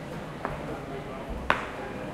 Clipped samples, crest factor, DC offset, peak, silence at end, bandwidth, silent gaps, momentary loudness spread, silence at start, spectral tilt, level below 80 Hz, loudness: under 0.1%; 32 dB; under 0.1%; -2 dBFS; 0 s; 16 kHz; none; 9 LU; 0 s; -5.5 dB/octave; -46 dBFS; -33 LUFS